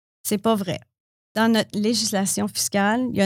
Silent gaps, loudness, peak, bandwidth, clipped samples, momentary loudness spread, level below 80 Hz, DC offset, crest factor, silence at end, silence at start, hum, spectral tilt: 1.00-1.35 s; -22 LUFS; -8 dBFS; 19 kHz; under 0.1%; 8 LU; -64 dBFS; under 0.1%; 14 dB; 0 s; 0.25 s; none; -3.5 dB/octave